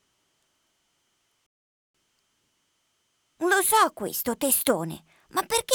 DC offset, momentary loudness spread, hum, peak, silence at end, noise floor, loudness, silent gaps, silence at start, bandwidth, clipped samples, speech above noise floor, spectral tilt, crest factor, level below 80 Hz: under 0.1%; 11 LU; none; -4 dBFS; 0 s; -73 dBFS; -24 LUFS; none; 3.4 s; over 20 kHz; under 0.1%; 48 dB; -2 dB/octave; 24 dB; -64 dBFS